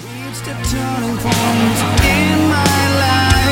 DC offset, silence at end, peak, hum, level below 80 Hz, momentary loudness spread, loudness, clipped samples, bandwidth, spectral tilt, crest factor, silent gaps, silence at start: under 0.1%; 0 s; 0 dBFS; none; -26 dBFS; 9 LU; -14 LUFS; under 0.1%; 17 kHz; -4.5 dB/octave; 14 dB; none; 0 s